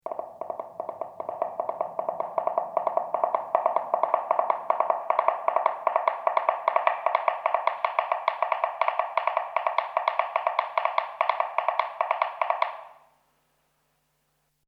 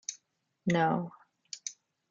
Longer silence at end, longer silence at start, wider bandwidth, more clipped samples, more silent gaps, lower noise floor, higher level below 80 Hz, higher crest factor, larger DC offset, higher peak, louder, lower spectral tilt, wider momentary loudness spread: first, 1.75 s vs 0.4 s; about the same, 0.05 s vs 0.1 s; second, 5.8 kHz vs 7.8 kHz; neither; neither; second, -73 dBFS vs -77 dBFS; second, -82 dBFS vs -74 dBFS; about the same, 22 dB vs 20 dB; neither; first, -4 dBFS vs -14 dBFS; first, -27 LUFS vs -33 LUFS; about the same, -4 dB/octave vs -5 dB/octave; second, 7 LU vs 17 LU